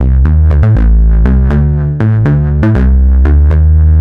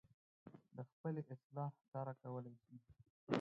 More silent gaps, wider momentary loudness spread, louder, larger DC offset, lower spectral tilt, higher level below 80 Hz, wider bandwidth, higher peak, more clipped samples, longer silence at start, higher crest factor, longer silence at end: second, none vs 0.92-1.04 s, 1.44-1.50 s, 1.88-1.92 s, 3.10-3.27 s; second, 3 LU vs 18 LU; first, -9 LUFS vs -50 LUFS; neither; first, -11 dB/octave vs -6.5 dB/octave; first, -8 dBFS vs -84 dBFS; second, 3.2 kHz vs 5.2 kHz; first, 0 dBFS vs -20 dBFS; neither; second, 0 s vs 0.45 s; second, 6 dB vs 30 dB; about the same, 0 s vs 0 s